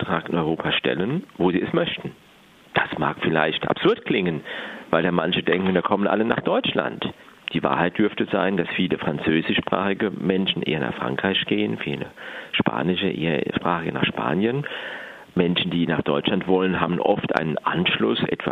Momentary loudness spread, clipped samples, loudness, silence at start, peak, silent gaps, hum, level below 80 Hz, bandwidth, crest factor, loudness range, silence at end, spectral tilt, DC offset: 7 LU; under 0.1%; -23 LUFS; 0 s; 0 dBFS; none; none; -56 dBFS; 6.6 kHz; 22 dB; 2 LU; 0 s; -7.5 dB/octave; under 0.1%